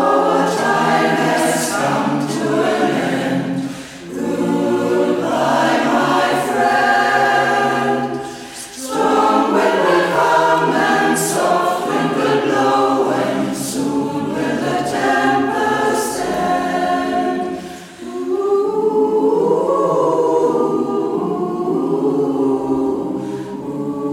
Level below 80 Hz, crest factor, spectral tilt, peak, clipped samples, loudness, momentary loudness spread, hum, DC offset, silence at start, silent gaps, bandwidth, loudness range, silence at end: -54 dBFS; 14 dB; -4.5 dB/octave; -2 dBFS; under 0.1%; -16 LUFS; 9 LU; none; under 0.1%; 0 s; none; 16.5 kHz; 4 LU; 0 s